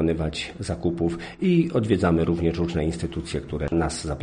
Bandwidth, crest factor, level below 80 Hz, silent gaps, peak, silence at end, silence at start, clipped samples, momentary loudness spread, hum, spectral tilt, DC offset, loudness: 10 kHz; 16 dB; -38 dBFS; none; -8 dBFS; 0 s; 0 s; under 0.1%; 9 LU; none; -6.5 dB/octave; under 0.1%; -25 LUFS